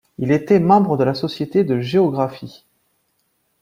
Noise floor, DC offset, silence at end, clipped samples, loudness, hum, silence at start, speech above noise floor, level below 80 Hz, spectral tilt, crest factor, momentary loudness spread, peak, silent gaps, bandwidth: -67 dBFS; under 0.1%; 1.1 s; under 0.1%; -17 LUFS; none; 0.2 s; 50 dB; -58 dBFS; -8 dB/octave; 18 dB; 10 LU; -2 dBFS; none; 16 kHz